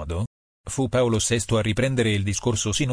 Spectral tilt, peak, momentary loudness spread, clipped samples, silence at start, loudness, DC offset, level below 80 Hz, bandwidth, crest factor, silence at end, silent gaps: -4.5 dB/octave; -10 dBFS; 10 LU; under 0.1%; 0 s; -23 LUFS; under 0.1%; -42 dBFS; 10.5 kHz; 14 dB; 0 s; 0.27-0.64 s